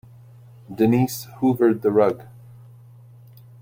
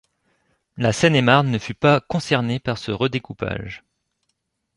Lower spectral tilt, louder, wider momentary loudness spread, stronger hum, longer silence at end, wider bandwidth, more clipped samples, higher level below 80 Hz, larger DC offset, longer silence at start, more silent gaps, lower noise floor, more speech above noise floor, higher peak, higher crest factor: first, -7 dB/octave vs -5.5 dB/octave; about the same, -20 LUFS vs -20 LUFS; about the same, 10 LU vs 12 LU; neither; first, 1.4 s vs 1 s; first, 16.5 kHz vs 11.5 kHz; neither; second, -60 dBFS vs -50 dBFS; neither; about the same, 0.7 s vs 0.75 s; neither; second, -46 dBFS vs -74 dBFS; second, 27 dB vs 54 dB; about the same, -4 dBFS vs -2 dBFS; about the same, 18 dB vs 20 dB